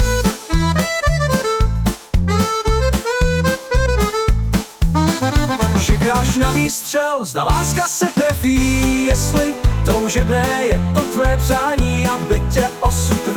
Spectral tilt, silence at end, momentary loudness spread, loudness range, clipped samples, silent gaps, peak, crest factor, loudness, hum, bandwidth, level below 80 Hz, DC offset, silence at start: -5 dB/octave; 0 s; 3 LU; 1 LU; under 0.1%; none; -4 dBFS; 12 dB; -17 LUFS; none; 19.5 kHz; -22 dBFS; under 0.1%; 0 s